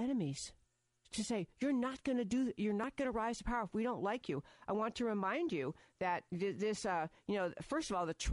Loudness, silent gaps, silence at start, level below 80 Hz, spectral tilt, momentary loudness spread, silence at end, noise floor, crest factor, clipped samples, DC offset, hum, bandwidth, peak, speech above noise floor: -39 LUFS; none; 0 s; -58 dBFS; -5 dB/octave; 5 LU; 0 s; -75 dBFS; 12 dB; under 0.1%; under 0.1%; none; 11.5 kHz; -26 dBFS; 36 dB